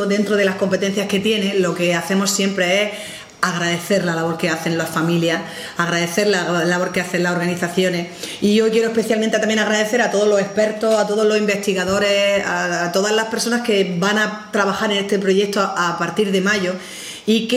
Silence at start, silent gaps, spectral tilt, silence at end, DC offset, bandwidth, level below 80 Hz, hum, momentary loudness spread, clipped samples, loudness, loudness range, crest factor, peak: 0 s; none; -4 dB/octave; 0 s; under 0.1%; 16 kHz; -60 dBFS; none; 4 LU; under 0.1%; -18 LUFS; 2 LU; 18 dB; 0 dBFS